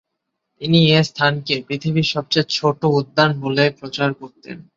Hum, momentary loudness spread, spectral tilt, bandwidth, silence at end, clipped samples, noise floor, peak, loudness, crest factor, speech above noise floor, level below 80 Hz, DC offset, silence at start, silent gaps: none; 8 LU; -6 dB/octave; 7.6 kHz; 0.15 s; under 0.1%; -77 dBFS; -2 dBFS; -18 LUFS; 16 dB; 58 dB; -58 dBFS; under 0.1%; 0.6 s; none